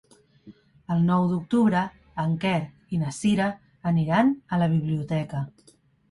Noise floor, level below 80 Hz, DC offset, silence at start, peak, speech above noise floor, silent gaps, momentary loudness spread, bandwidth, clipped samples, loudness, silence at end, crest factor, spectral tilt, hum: -52 dBFS; -58 dBFS; under 0.1%; 0.45 s; -8 dBFS; 28 dB; none; 10 LU; 11.5 kHz; under 0.1%; -25 LUFS; 0.6 s; 16 dB; -7 dB/octave; none